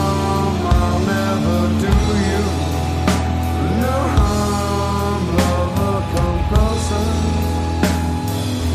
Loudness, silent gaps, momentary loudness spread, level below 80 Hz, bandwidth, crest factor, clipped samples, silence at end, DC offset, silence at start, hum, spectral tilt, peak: -18 LUFS; none; 3 LU; -24 dBFS; 15.5 kHz; 14 dB; under 0.1%; 0 s; under 0.1%; 0 s; none; -6 dB/octave; -4 dBFS